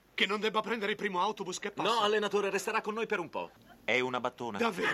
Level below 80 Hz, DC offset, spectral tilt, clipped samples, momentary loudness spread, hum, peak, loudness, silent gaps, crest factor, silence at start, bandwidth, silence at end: -74 dBFS; under 0.1%; -3.5 dB/octave; under 0.1%; 9 LU; none; -14 dBFS; -32 LUFS; none; 18 dB; 0.15 s; 14.5 kHz; 0 s